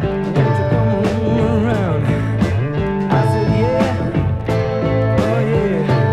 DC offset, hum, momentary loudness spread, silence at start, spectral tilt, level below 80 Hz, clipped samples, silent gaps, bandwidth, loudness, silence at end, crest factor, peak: under 0.1%; none; 3 LU; 0 s; -8.5 dB/octave; -34 dBFS; under 0.1%; none; 11 kHz; -17 LUFS; 0 s; 14 dB; -2 dBFS